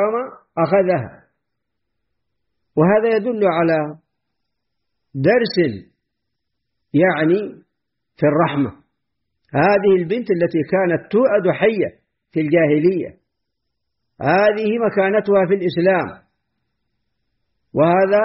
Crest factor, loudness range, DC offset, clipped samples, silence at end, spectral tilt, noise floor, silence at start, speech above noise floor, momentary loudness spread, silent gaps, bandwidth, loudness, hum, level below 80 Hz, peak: 16 dB; 3 LU; under 0.1%; under 0.1%; 0 s; -6 dB/octave; -78 dBFS; 0 s; 62 dB; 10 LU; none; 5.8 kHz; -17 LUFS; none; -58 dBFS; -4 dBFS